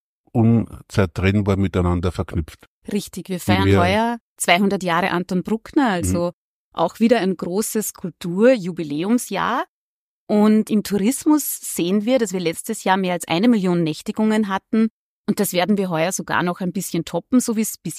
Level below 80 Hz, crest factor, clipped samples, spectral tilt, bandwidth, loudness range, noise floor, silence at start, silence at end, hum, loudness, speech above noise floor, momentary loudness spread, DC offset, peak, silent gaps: -46 dBFS; 18 dB; under 0.1%; -5.5 dB/octave; 15.5 kHz; 2 LU; under -90 dBFS; 0.35 s; 0 s; none; -20 LUFS; over 71 dB; 10 LU; under 0.1%; -2 dBFS; 2.67-2.82 s, 4.20-4.36 s, 6.33-6.72 s, 9.68-10.27 s, 14.90-15.24 s